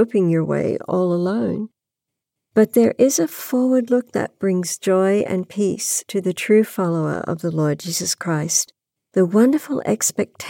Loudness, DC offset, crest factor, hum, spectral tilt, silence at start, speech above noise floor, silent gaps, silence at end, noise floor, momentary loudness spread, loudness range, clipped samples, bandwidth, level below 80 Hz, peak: -19 LUFS; under 0.1%; 16 dB; none; -5 dB/octave; 0 s; 65 dB; none; 0 s; -84 dBFS; 8 LU; 2 LU; under 0.1%; 17 kHz; -66 dBFS; -4 dBFS